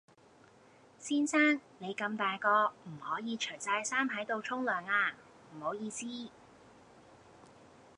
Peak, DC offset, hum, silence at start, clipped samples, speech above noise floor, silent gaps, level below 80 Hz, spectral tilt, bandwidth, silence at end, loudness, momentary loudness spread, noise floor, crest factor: -16 dBFS; under 0.1%; none; 1 s; under 0.1%; 28 dB; none; -80 dBFS; -3 dB/octave; 11 kHz; 0.3 s; -33 LUFS; 15 LU; -62 dBFS; 20 dB